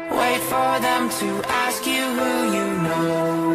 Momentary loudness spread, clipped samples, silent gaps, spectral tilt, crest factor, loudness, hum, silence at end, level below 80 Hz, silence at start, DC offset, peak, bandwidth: 2 LU; under 0.1%; none; -4 dB/octave; 16 dB; -21 LUFS; none; 0 s; -56 dBFS; 0 s; under 0.1%; -6 dBFS; 15.5 kHz